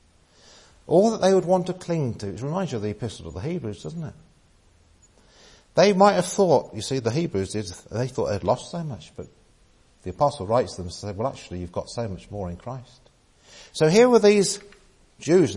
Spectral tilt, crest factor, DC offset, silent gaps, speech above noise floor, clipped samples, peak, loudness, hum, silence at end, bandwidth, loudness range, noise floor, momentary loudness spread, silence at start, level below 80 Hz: -5.5 dB/octave; 20 dB; under 0.1%; none; 35 dB; under 0.1%; -4 dBFS; -23 LUFS; none; 0 s; 11.5 kHz; 8 LU; -58 dBFS; 18 LU; 0.9 s; -56 dBFS